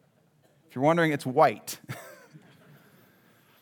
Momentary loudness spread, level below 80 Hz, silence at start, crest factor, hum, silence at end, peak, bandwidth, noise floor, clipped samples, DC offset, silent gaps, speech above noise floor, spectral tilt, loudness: 19 LU; -86 dBFS; 0.75 s; 22 dB; none; 1.5 s; -8 dBFS; over 20 kHz; -64 dBFS; under 0.1%; under 0.1%; none; 39 dB; -5.5 dB/octave; -25 LUFS